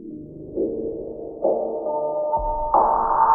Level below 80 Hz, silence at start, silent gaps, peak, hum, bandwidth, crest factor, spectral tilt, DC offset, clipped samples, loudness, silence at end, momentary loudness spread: -40 dBFS; 0 s; none; -6 dBFS; none; 2 kHz; 18 dB; -13.5 dB/octave; under 0.1%; under 0.1%; -23 LUFS; 0 s; 15 LU